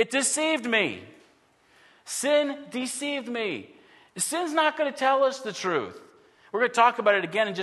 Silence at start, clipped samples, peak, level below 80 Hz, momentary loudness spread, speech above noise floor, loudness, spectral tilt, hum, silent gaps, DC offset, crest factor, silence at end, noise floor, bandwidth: 0 s; under 0.1%; -6 dBFS; -80 dBFS; 11 LU; 36 dB; -25 LUFS; -2 dB/octave; none; none; under 0.1%; 20 dB; 0 s; -62 dBFS; 12.5 kHz